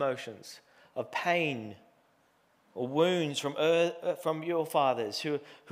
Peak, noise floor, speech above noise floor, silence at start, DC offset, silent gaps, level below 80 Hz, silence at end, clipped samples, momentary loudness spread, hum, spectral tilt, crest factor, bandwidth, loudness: -12 dBFS; -68 dBFS; 38 dB; 0 s; under 0.1%; none; -86 dBFS; 0 s; under 0.1%; 16 LU; none; -4.5 dB/octave; 18 dB; 16 kHz; -31 LUFS